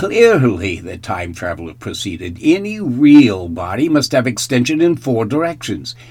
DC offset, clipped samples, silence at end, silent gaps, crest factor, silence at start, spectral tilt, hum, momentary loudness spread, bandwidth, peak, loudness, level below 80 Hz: under 0.1%; 0.3%; 0.05 s; none; 14 dB; 0 s; -5.5 dB/octave; none; 15 LU; 15 kHz; 0 dBFS; -15 LUFS; -46 dBFS